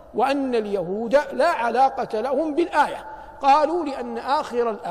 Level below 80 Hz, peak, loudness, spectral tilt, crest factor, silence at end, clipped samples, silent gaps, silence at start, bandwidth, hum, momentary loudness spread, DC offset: -54 dBFS; -6 dBFS; -22 LUFS; -5 dB/octave; 14 dB; 0 s; under 0.1%; none; 0 s; 14.5 kHz; none; 7 LU; under 0.1%